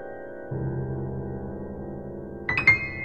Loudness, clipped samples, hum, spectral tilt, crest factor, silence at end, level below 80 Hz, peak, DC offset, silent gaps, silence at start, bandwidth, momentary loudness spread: -26 LUFS; under 0.1%; none; -7 dB/octave; 24 dB; 0 s; -46 dBFS; -6 dBFS; 0.4%; none; 0 s; 7.8 kHz; 18 LU